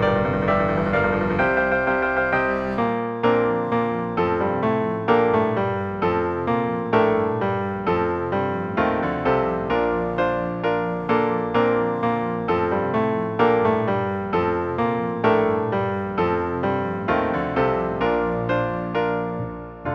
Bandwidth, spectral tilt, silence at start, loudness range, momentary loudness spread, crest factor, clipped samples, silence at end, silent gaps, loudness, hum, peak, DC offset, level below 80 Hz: 6.6 kHz; -8.5 dB/octave; 0 s; 2 LU; 4 LU; 16 dB; under 0.1%; 0 s; none; -22 LUFS; none; -6 dBFS; under 0.1%; -46 dBFS